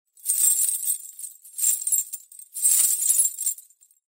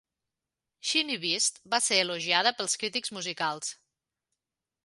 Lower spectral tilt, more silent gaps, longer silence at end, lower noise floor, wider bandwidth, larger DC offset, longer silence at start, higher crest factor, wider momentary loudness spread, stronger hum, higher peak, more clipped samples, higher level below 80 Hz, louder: second, 9 dB/octave vs -0.5 dB/octave; neither; second, 0.55 s vs 1.1 s; second, -51 dBFS vs -89 dBFS; first, 16.5 kHz vs 12 kHz; neither; second, 0.25 s vs 0.85 s; about the same, 20 dB vs 24 dB; first, 19 LU vs 9 LU; neither; first, -4 dBFS vs -8 dBFS; neither; second, under -90 dBFS vs -82 dBFS; first, -20 LUFS vs -27 LUFS